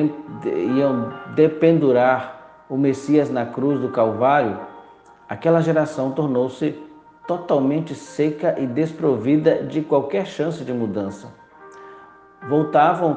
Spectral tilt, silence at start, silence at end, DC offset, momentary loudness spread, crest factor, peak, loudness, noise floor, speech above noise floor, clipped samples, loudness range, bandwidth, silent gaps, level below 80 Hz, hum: -8 dB/octave; 0 s; 0 s; under 0.1%; 13 LU; 16 dB; -4 dBFS; -20 LUFS; -47 dBFS; 27 dB; under 0.1%; 4 LU; 9 kHz; none; -64 dBFS; none